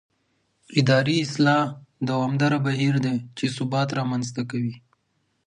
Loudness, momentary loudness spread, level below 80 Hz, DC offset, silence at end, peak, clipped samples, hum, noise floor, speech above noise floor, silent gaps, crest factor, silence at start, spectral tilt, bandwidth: -23 LUFS; 9 LU; -66 dBFS; under 0.1%; 0.7 s; -6 dBFS; under 0.1%; none; -71 dBFS; 49 dB; none; 18 dB; 0.7 s; -6 dB/octave; 10.5 kHz